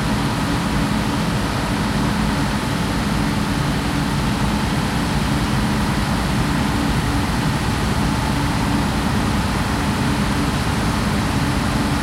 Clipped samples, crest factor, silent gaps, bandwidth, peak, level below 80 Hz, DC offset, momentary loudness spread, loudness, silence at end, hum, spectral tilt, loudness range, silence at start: under 0.1%; 12 dB; none; 16 kHz; -6 dBFS; -28 dBFS; under 0.1%; 1 LU; -20 LUFS; 0 s; none; -5.5 dB/octave; 1 LU; 0 s